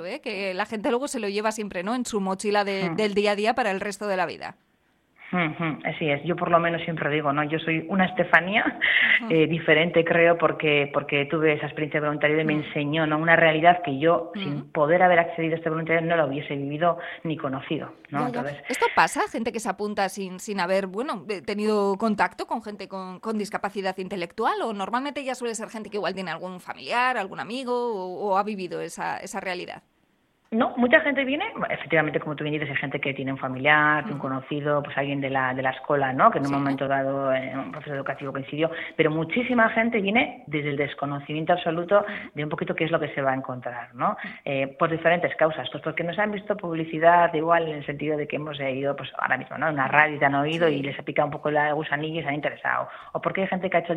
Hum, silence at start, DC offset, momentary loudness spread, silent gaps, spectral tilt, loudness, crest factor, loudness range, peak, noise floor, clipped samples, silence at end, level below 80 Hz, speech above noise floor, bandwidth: none; 0 s; under 0.1%; 12 LU; none; -5.5 dB/octave; -24 LUFS; 24 dB; 7 LU; 0 dBFS; -67 dBFS; under 0.1%; 0 s; -64 dBFS; 42 dB; 13.5 kHz